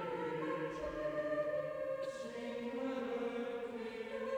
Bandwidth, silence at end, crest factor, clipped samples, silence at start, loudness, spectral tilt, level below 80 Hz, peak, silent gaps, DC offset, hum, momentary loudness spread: 17 kHz; 0 s; 12 dB; under 0.1%; 0 s; -41 LUFS; -6 dB/octave; -66 dBFS; -28 dBFS; none; under 0.1%; none; 6 LU